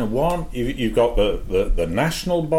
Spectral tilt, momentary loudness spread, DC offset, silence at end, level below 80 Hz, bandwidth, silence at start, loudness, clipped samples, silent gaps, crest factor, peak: -6 dB/octave; 5 LU; under 0.1%; 0 s; -28 dBFS; 16.5 kHz; 0 s; -21 LUFS; under 0.1%; none; 14 dB; -6 dBFS